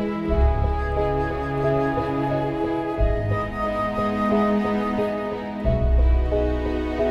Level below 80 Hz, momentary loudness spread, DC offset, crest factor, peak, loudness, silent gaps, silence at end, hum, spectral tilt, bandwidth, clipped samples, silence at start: -26 dBFS; 5 LU; under 0.1%; 14 dB; -8 dBFS; -23 LUFS; none; 0 s; none; -8.5 dB/octave; 6 kHz; under 0.1%; 0 s